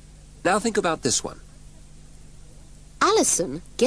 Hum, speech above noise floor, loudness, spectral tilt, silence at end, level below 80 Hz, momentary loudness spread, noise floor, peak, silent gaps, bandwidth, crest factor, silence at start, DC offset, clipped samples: 50 Hz at -50 dBFS; 23 dB; -22 LUFS; -2.5 dB/octave; 0 s; -48 dBFS; 9 LU; -46 dBFS; -4 dBFS; none; 11 kHz; 22 dB; 0 s; 0.3%; under 0.1%